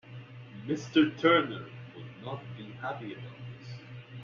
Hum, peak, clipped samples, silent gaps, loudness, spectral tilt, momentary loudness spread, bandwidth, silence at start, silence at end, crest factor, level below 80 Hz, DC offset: none; -10 dBFS; under 0.1%; none; -29 LUFS; -4 dB/octave; 21 LU; 7.2 kHz; 0.05 s; 0 s; 22 dB; -70 dBFS; under 0.1%